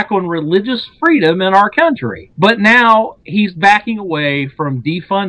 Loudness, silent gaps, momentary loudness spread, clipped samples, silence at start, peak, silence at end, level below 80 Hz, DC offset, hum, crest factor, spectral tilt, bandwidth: -12 LUFS; none; 11 LU; 0.3%; 0 s; 0 dBFS; 0 s; -52 dBFS; under 0.1%; none; 12 dB; -6 dB/octave; 11 kHz